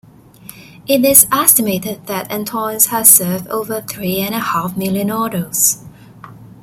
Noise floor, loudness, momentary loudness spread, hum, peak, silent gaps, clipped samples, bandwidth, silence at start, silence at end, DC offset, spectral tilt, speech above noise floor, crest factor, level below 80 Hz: -39 dBFS; -13 LUFS; 14 LU; none; 0 dBFS; none; 0.3%; over 20 kHz; 0.55 s; 0.1 s; under 0.1%; -3 dB/octave; 24 dB; 16 dB; -52 dBFS